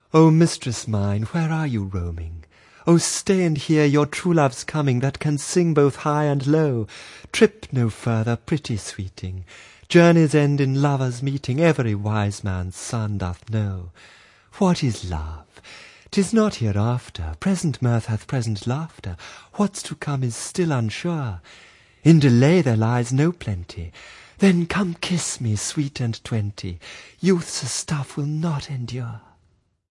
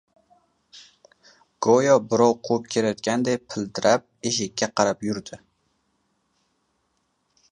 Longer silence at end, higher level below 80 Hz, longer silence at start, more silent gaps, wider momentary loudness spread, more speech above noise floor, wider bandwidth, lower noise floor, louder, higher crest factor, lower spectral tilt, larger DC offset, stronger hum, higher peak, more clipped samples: second, 0.7 s vs 2.15 s; first, -50 dBFS vs -64 dBFS; second, 0.15 s vs 0.75 s; neither; first, 17 LU vs 11 LU; second, 42 dB vs 50 dB; about the same, 11.5 kHz vs 10.5 kHz; second, -63 dBFS vs -72 dBFS; about the same, -21 LUFS vs -22 LUFS; about the same, 20 dB vs 22 dB; first, -6 dB/octave vs -4 dB/octave; neither; neither; about the same, -2 dBFS vs -2 dBFS; neither